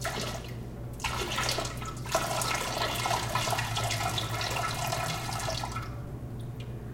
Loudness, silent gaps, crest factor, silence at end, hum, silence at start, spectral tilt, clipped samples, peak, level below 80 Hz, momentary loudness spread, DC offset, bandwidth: -32 LUFS; none; 20 dB; 0 s; 60 Hz at -40 dBFS; 0 s; -3 dB/octave; under 0.1%; -14 dBFS; -46 dBFS; 11 LU; under 0.1%; 17 kHz